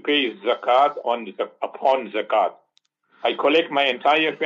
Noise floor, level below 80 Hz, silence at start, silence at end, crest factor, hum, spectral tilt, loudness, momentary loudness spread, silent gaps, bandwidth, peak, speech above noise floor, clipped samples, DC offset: -66 dBFS; -80 dBFS; 0.05 s; 0 s; 16 dB; none; -4.5 dB/octave; -21 LUFS; 8 LU; none; 7.6 kHz; -6 dBFS; 45 dB; under 0.1%; under 0.1%